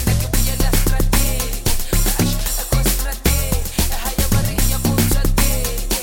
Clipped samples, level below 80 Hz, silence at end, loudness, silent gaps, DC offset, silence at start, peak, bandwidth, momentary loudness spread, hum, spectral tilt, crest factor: under 0.1%; -18 dBFS; 0 s; -18 LUFS; none; under 0.1%; 0 s; -2 dBFS; 17 kHz; 3 LU; none; -4 dB/octave; 14 dB